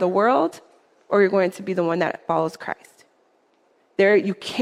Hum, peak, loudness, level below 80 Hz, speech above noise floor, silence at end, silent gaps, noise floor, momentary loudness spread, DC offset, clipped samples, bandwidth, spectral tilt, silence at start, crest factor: none; -6 dBFS; -21 LUFS; -72 dBFS; 42 dB; 0 s; none; -62 dBFS; 14 LU; under 0.1%; under 0.1%; 13 kHz; -6 dB/octave; 0 s; 18 dB